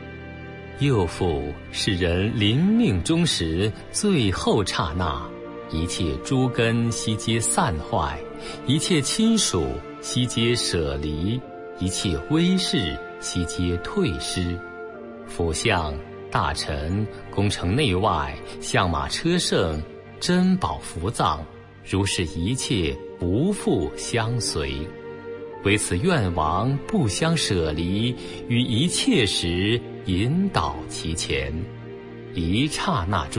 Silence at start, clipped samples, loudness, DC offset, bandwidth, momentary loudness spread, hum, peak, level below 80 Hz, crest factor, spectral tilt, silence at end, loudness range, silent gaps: 0 s; under 0.1%; -23 LUFS; under 0.1%; 11.5 kHz; 12 LU; none; -6 dBFS; -42 dBFS; 18 dB; -4.5 dB/octave; 0 s; 3 LU; none